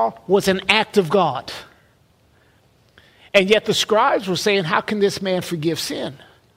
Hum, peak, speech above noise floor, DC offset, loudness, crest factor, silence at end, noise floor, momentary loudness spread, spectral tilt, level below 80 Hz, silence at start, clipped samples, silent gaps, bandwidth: none; 0 dBFS; 38 dB; under 0.1%; -19 LUFS; 20 dB; 0.4 s; -57 dBFS; 11 LU; -4 dB/octave; -56 dBFS; 0 s; under 0.1%; none; 16 kHz